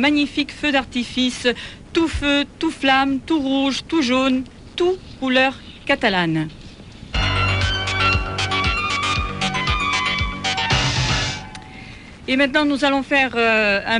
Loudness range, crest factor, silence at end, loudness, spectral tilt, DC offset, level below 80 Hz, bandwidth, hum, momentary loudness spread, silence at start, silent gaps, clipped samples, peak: 1 LU; 16 dB; 0 s; -19 LUFS; -4.5 dB/octave; under 0.1%; -34 dBFS; 11 kHz; none; 8 LU; 0 s; none; under 0.1%; -4 dBFS